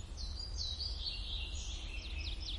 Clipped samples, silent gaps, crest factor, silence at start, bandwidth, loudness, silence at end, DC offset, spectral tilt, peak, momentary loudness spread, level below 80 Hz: under 0.1%; none; 14 dB; 0 s; 11.5 kHz; -41 LUFS; 0 s; under 0.1%; -2.5 dB/octave; -28 dBFS; 5 LU; -44 dBFS